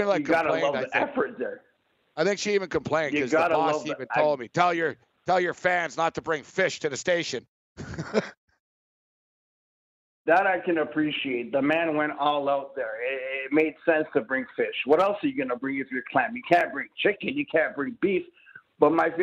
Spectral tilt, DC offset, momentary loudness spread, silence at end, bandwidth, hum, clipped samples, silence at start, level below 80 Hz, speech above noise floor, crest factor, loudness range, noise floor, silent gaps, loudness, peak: -4.5 dB/octave; under 0.1%; 8 LU; 0 s; 8.6 kHz; none; under 0.1%; 0 s; -64 dBFS; over 65 dB; 22 dB; 4 LU; under -90 dBFS; 7.48-7.76 s, 8.37-8.48 s, 8.60-10.25 s; -26 LUFS; -4 dBFS